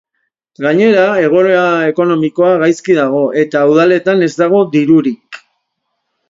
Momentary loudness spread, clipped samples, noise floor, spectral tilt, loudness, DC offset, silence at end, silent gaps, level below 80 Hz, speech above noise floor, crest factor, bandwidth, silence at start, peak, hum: 4 LU; under 0.1%; -70 dBFS; -6.5 dB/octave; -11 LUFS; under 0.1%; 0.9 s; none; -60 dBFS; 60 dB; 12 dB; 7.8 kHz; 0.6 s; 0 dBFS; none